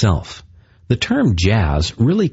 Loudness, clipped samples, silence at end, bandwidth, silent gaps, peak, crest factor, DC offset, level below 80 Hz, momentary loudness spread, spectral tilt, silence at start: -17 LUFS; under 0.1%; 0.05 s; 8 kHz; none; -2 dBFS; 14 dB; under 0.1%; -30 dBFS; 11 LU; -6 dB/octave; 0 s